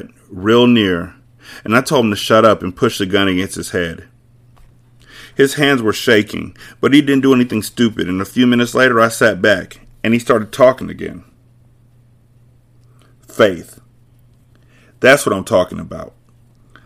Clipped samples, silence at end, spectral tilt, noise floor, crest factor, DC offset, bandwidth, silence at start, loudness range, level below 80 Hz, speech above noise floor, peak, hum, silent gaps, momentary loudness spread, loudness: 0.1%; 0.75 s; -5 dB/octave; -49 dBFS; 16 dB; under 0.1%; 16 kHz; 0.05 s; 8 LU; -48 dBFS; 35 dB; 0 dBFS; none; none; 17 LU; -14 LUFS